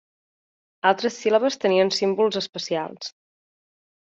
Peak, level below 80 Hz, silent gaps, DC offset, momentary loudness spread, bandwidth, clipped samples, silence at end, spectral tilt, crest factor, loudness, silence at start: -6 dBFS; -72 dBFS; 2.49-2.53 s; under 0.1%; 10 LU; 7.8 kHz; under 0.1%; 1.05 s; -4 dB/octave; 20 dB; -22 LUFS; 0.85 s